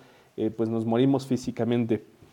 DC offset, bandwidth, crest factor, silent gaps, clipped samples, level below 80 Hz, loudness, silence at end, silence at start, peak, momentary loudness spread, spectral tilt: under 0.1%; 12.5 kHz; 16 dB; none; under 0.1%; -64 dBFS; -27 LUFS; 0.3 s; 0.35 s; -10 dBFS; 8 LU; -7.5 dB/octave